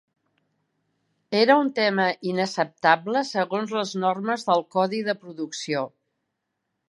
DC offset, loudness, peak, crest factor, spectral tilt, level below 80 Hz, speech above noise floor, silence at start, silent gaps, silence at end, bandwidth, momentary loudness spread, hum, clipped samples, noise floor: under 0.1%; -24 LUFS; -4 dBFS; 22 dB; -4.5 dB/octave; -80 dBFS; 56 dB; 1.3 s; none; 1.05 s; 11.5 kHz; 10 LU; none; under 0.1%; -79 dBFS